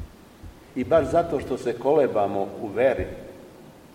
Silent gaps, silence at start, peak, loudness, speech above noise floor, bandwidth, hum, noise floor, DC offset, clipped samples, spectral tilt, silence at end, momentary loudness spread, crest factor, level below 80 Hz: none; 0 s; -6 dBFS; -24 LUFS; 24 dB; 16 kHz; none; -47 dBFS; under 0.1%; under 0.1%; -7 dB/octave; 0.25 s; 16 LU; 18 dB; -48 dBFS